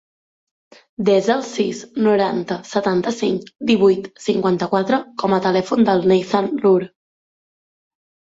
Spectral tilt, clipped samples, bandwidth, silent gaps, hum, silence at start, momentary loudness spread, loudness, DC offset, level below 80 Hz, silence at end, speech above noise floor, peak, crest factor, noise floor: -6 dB/octave; under 0.1%; 8 kHz; none; none; 1 s; 7 LU; -18 LUFS; under 0.1%; -60 dBFS; 1.4 s; over 73 dB; -4 dBFS; 16 dB; under -90 dBFS